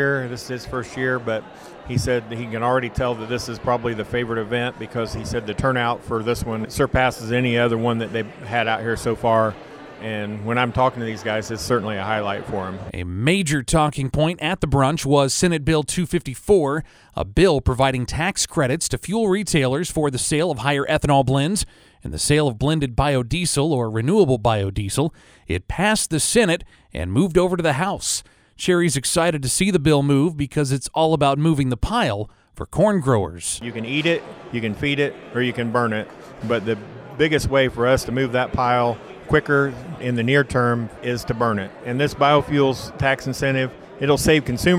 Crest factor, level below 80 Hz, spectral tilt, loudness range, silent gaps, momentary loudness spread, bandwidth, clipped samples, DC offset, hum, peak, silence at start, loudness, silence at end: 16 dB; -38 dBFS; -5 dB/octave; 4 LU; none; 10 LU; 19.5 kHz; under 0.1%; under 0.1%; none; -4 dBFS; 0 s; -21 LUFS; 0 s